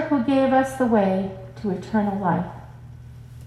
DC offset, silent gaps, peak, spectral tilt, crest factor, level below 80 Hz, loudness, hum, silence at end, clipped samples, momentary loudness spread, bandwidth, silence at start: under 0.1%; none; -6 dBFS; -7.5 dB/octave; 16 dB; -50 dBFS; -22 LUFS; none; 0 s; under 0.1%; 23 LU; 13 kHz; 0 s